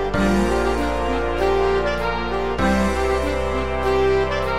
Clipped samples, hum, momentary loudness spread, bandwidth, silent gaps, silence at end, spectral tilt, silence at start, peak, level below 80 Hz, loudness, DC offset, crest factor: under 0.1%; none; 4 LU; 14.5 kHz; none; 0 s; -6 dB/octave; 0 s; -8 dBFS; -30 dBFS; -20 LUFS; 2%; 12 dB